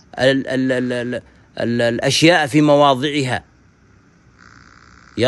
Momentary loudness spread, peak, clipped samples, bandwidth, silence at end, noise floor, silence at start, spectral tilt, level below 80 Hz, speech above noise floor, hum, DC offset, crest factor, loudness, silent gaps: 14 LU; -2 dBFS; under 0.1%; 12.5 kHz; 0 s; -51 dBFS; 0.15 s; -5 dB/octave; -54 dBFS; 35 dB; none; under 0.1%; 16 dB; -16 LUFS; none